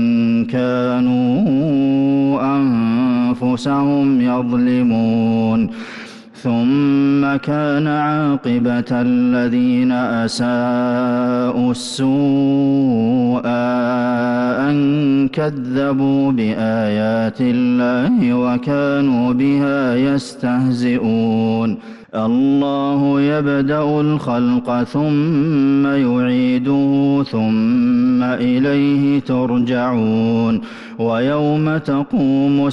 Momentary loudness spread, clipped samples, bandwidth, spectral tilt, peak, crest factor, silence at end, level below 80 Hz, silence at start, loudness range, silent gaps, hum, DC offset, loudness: 4 LU; under 0.1%; 11 kHz; -7.5 dB/octave; -8 dBFS; 8 dB; 0 s; -52 dBFS; 0 s; 1 LU; none; none; under 0.1%; -16 LUFS